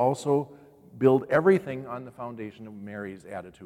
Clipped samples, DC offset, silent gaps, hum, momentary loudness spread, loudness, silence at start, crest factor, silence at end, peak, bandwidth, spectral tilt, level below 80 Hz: under 0.1%; under 0.1%; none; none; 18 LU; -25 LUFS; 0 s; 20 dB; 0 s; -8 dBFS; 11.5 kHz; -7.5 dB/octave; -66 dBFS